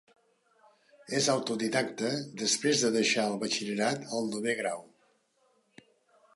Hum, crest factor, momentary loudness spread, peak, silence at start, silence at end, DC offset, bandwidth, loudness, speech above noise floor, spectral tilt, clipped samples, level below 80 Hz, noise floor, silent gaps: none; 20 dB; 7 LU; -12 dBFS; 1.1 s; 1.5 s; under 0.1%; 11.5 kHz; -29 LUFS; 41 dB; -3 dB/octave; under 0.1%; -80 dBFS; -71 dBFS; none